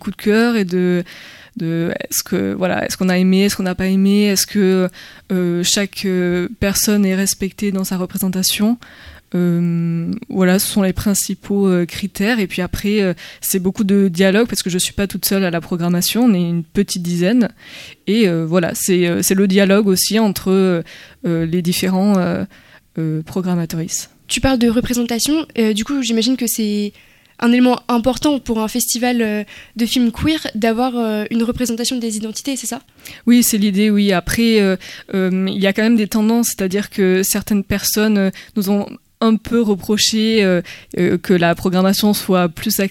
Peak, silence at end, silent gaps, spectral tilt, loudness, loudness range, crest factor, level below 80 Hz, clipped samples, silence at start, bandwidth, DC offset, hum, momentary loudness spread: 0 dBFS; 0 s; none; -4.5 dB/octave; -16 LUFS; 3 LU; 16 dB; -42 dBFS; under 0.1%; 0.05 s; 17 kHz; under 0.1%; none; 8 LU